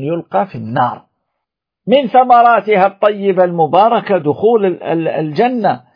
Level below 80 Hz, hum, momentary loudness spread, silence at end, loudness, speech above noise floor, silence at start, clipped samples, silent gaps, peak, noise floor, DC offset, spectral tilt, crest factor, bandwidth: -62 dBFS; none; 9 LU; 0.2 s; -13 LUFS; 65 dB; 0 s; under 0.1%; none; 0 dBFS; -77 dBFS; under 0.1%; -9 dB/octave; 12 dB; 5.2 kHz